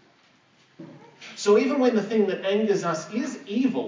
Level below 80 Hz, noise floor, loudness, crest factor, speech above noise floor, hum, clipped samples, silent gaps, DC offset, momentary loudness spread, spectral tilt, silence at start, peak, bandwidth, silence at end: -88 dBFS; -60 dBFS; -24 LUFS; 16 dB; 37 dB; none; under 0.1%; none; under 0.1%; 10 LU; -5 dB/octave; 0.8 s; -8 dBFS; 7.6 kHz; 0 s